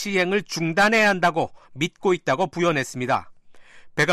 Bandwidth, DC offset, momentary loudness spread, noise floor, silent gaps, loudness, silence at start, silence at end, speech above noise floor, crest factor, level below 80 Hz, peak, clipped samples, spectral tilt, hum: 14.5 kHz; under 0.1%; 11 LU; -46 dBFS; none; -22 LUFS; 0 s; 0 s; 24 dB; 14 dB; -58 dBFS; -8 dBFS; under 0.1%; -4.5 dB/octave; none